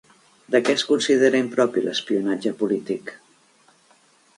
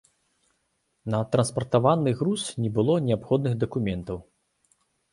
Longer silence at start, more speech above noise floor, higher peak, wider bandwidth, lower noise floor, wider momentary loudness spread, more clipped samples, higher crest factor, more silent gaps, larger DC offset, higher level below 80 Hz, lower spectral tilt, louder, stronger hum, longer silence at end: second, 0.5 s vs 1.05 s; second, 37 dB vs 49 dB; about the same, -4 dBFS vs -6 dBFS; about the same, 11.5 kHz vs 11.5 kHz; second, -58 dBFS vs -74 dBFS; about the same, 9 LU vs 10 LU; neither; about the same, 20 dB vs 20 dB; neither; neither; second, -72 dBFS vs -54 dBFS; second, -4 dB/octave vs -6.5 dB/octave; first, -21 LUFS vs -25 LUFS; neither; first, 1.2 s vs 0.9 s